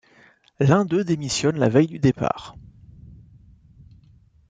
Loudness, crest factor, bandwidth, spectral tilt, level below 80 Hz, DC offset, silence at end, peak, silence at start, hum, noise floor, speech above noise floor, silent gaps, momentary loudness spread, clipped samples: -21 LUFS; 18 dB; 9.4 kHz; -6 dB/octave; -52 dBFS; under 0.1%; 2 s; -4 dBFS; 0.6 s; none; -55 dBFS; 35 dB; none; 8 LU; under 0.1%